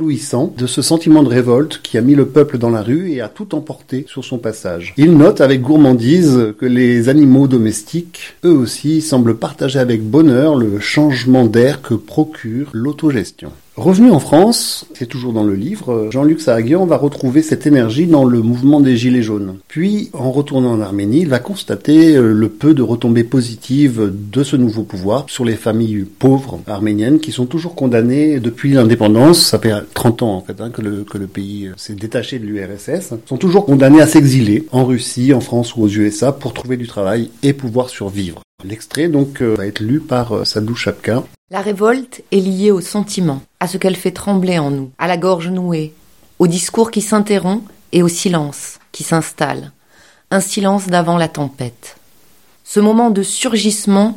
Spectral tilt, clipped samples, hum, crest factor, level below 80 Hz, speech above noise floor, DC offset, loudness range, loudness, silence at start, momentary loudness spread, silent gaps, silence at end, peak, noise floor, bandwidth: -6 dB/octave; 0.2%; none; 12 dB; -50 dBFS; 38 dB; 0.4%; 6 LU; -13 LUFS; 0 s; 13 LU; 38.44-38.58 s, 41.38-41.48 s; 0 s; 0 dBFS; -51 dBFS; 16.5 kHz